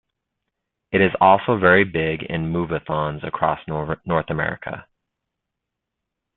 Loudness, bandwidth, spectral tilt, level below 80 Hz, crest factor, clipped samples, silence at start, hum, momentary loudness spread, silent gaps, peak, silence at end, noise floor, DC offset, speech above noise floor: -20 LUFS; 4.2 kHz; -11 dB/octave; -50 dBFS; 20 dB; under 0.1%; 0.9 s; none; 11 LU; none; -2 dBFS; 1.55 s; -82 dBFS; under 0.1%; 62 dB